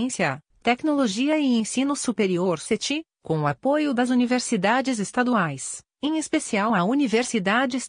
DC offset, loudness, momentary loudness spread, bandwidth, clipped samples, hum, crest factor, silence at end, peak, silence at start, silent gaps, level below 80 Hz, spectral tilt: under 0.1%; -23 LUFS; 6 LU; 10 kHz; under 0.1%; none; 18 dB; 0 s; -6 dBFS; 0 s; none; -66 dBFS; -4.5 dB/octave